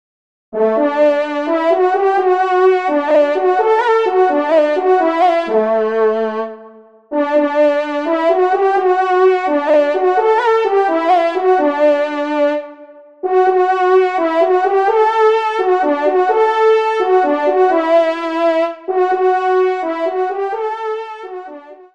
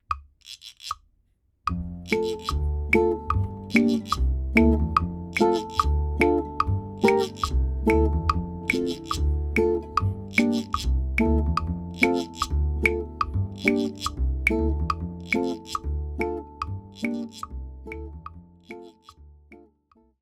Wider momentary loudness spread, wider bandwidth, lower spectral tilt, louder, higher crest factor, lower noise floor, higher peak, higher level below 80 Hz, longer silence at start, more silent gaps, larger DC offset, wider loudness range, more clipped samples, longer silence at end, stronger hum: second, 7 LU vs 15 LU; second, 7.6 kHz vs 14 kHz; second, -5 dB/octave vs -6.5 dB/octave; first, -14 LUFS vs -25 LUFS; second, 12 dB vs 22 dB; second, -41 dBFS vs -67 dBFS; about the same, -2 dBFS vs -2 dBFS; second, -70 dBFS vs -30 dBFS; first, 0.5 s vs 0.1 s; neither; first, 0.2% vs under 0.1%; second, 3 LU vs 10 LU; neither; second, 0.2 s vs 0.65 s; neither